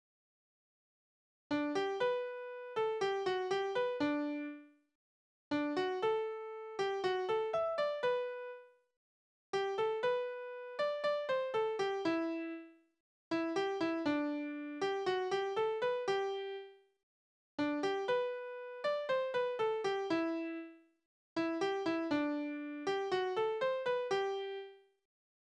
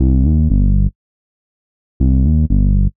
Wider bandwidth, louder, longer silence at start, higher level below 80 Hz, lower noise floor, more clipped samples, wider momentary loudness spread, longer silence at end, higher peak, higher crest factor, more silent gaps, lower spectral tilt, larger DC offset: first, 9.8 kHz vs 1.1 kHz; second, -37 LUFS vs -15 LUFS; first, 1.5 s vs 0 s; second, -80 dBFS vs -16 dBFS; about the same, under -90 dBFS vs under -90 dBFS; neither; first, 10 LU vs 5 LU; first, 0.8 s vs 0 s; second, -22 dBFS vs -4 dBFS; about the same, 14 dB vs 10 dB; first, 4.95-5.51 s, 8.97-9.53 s, 13.00-13.31 s, 17.03-17.58 s, 21.05-21.36 s vs 0.95-2.00 s; second, -4.5 dB/octave vs -19 dB/octave; second, under 0.1% vs 4%